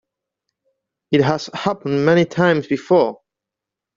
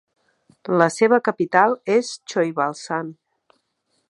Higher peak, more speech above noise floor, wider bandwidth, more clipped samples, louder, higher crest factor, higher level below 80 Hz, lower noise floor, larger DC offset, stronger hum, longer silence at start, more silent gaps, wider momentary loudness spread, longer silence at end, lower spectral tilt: about the same, -2 dBFS vs 0 dBFS; first, 68 dB vs 51 dB; second, 7.6 kHz vs 11.5 kHz; neither; about the same, -18 LUFS vs -20 LUFS; about the same, 16 dB vs 20 dB; first, -60 dBFS vs -74 dBFS; first, -85 dBFS vs -71 dBFS; neither; neither; first, 1.1 s vs 0.65 s; neither; second, 7 LU vs 11 LU; about the same, 0.85 s vs 0.95 s; first, -6.5 dB/octave vs -5 dB/octave